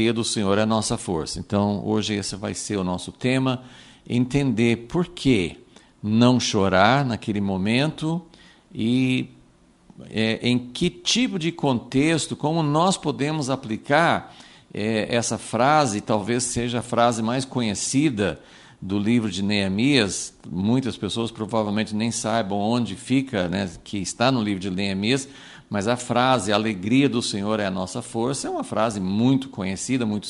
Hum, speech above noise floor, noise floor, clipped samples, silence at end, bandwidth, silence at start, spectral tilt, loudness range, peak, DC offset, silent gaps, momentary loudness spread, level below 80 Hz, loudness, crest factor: none; 33 dB; -55 dBFS; under 0.1%; 0 s; 11.5 kHz; 0 s; -5 dB/octave; 3 LU; -2 dBFS; under 0.1%; none; 9 LU; -52 dBFS; -23 LUFS; 20 dB